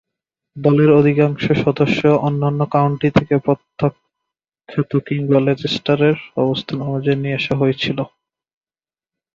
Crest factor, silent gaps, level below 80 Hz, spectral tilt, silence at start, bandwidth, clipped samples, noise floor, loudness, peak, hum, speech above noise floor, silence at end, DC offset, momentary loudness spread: 16 dB; none; -50 dBFS; -8 dB/octave; 0.55 s; 7.2 kHz; under 0.1%; under -90 dBFS; -17 LUFS; -2 dBFS; none; over 74 dB; 1.3 s; under 0.1%; 8 LU